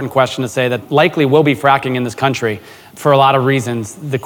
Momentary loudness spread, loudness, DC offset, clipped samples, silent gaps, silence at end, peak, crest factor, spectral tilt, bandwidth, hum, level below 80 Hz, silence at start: 10 LU; -14 LUFS; under 0.1%; under 0.1%; none; 0 s; 0 dBFS; 14 dB; -5.5 dB/octave; 18.5 kHz; none; -56 dBFS; 0 s